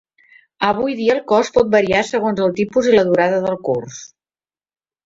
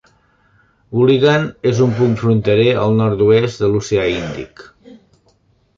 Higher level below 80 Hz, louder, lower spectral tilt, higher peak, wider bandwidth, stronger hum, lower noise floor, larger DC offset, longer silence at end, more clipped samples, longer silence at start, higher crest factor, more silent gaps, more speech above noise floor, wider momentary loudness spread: second, -52 dBFS vs -46 dBFS; about the same, -17 LUFS vs -15 LUFS; second, -5 dB/octave vs -7 dB/octave; about the same, -2 dBFS vs -2 dBFS; about the same, 8 kHz vs 7.6 kHz; neither; first, under -90 dBFS vs -57 dBFS; neither; first, 1 s vs 0.85 s; neither; second, 0.6 s vs 0.9 s; about the same, 16 dB vs 14 dB; neither; first, over 74 dB vs 43 dB; about the same, 8 LU vs 10 LU